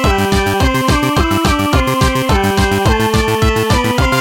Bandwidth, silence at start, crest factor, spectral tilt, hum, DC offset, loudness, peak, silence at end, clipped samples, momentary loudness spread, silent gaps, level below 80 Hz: 17 kHz; 0 s; 12 dB; -5 dB/octave; none; under 0.1%; -13 LUFS; -2 dBFS; 0 s; under 0.1%; 1 LU; none; -20 dBFS